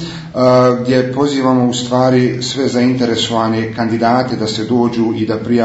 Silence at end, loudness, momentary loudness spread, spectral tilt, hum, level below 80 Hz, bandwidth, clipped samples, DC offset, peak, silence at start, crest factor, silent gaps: 0 s; -14 LUFS; 6 LU; -6 dB/octave; none; -50 dBFS; 8 kHz; under 0.1%; under 0.1%; 0 dBFS; 0 s; 14 dB; none